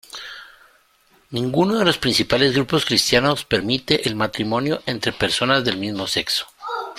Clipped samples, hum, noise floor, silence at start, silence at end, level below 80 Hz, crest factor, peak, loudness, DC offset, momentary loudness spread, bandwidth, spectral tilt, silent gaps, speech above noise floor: under 0.1%; none; -58 dBFS; 0.15 s; 0 s; -50 dBFS; 20 dB; -2 dBFS; -19 LUFS; under 0.1%; 12 LU; 16.5 kHz; -4 dB/octave; none; 38 dB